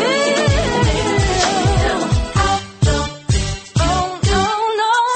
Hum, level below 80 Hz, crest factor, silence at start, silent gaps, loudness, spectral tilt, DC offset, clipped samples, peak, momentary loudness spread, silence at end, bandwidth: none; -24 dBFS; 12 dB; 0 s; none; -17 LUFS; -4.5 dB/octave; under 0.1%; under 0.1%; -4 dBFS; 4 LU; 0 s; 8.8 kHz